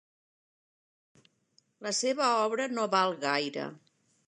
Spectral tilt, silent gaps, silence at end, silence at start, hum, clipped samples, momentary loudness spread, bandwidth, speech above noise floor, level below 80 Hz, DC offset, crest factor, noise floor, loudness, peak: -2.5 dB/octave; none; 0.5 s; 1.8 s; none; under 0.1%; 12 LU; 11 kHz; 41 dB; -88 dBFS; under 0.1%; 20 dB; -70 dBFS; -29 LUFS; -12 dBFS